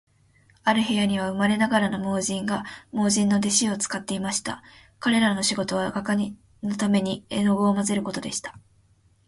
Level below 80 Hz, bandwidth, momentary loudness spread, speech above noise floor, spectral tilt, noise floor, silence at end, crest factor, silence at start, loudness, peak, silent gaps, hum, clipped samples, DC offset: -60 dBFS; 11.5 kHz; 10 LU; 37 dB; -4 dB/octave; -61 dBFS; 0.7 s; 18 dB; 0.65 s; -24 LUFS; -6 dBFS; none; none; under 0.1%; under 0.1%